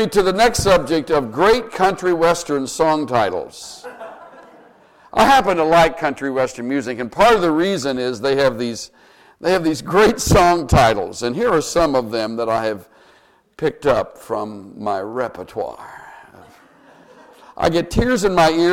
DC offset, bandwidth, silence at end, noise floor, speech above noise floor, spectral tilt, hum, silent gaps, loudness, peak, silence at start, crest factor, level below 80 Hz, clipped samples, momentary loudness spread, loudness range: under 0.1%; 17 kHz; 0 s; -53 dBFS; 36 dB; -4.5 dB/octave; none; none; -17 LUFS; -2 dBFS; 0 s; 16 dB; -36 dBFS; under 0.1%; 14 LU; 8 LU